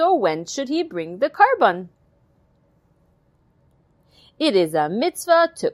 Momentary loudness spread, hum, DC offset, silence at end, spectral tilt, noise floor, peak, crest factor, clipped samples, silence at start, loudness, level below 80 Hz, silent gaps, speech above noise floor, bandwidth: 10 LU; none; under 0.1%; 0 s; -4 dB/octave; -61 dBFS; -2 dBFS; 20 dB; under 0.1%; 0 s; -20 LUFS; -66 dBFS; none; 41 dB; 16 kHz